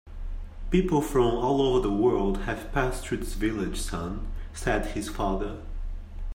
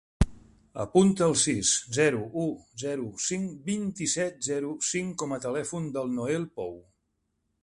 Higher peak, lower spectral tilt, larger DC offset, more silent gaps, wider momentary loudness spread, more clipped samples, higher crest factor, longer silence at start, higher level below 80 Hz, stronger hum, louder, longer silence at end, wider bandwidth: second, -10 dBFS vs -4 dBFS; first, -6 dB/octave vs -4 dB/octave; neither; neither; first, 17 LU vs 11 LU; neither; second, 18 dB vs 24 dB; second, 0.05 s vs 0.2 s; first, -34 dBFS vs -42 dBFS; neither; about the same, -27 LUFS vs -28 LUFS; second, 0 s vs 0.8 s; first, 16 kHz vs 11.5 kHz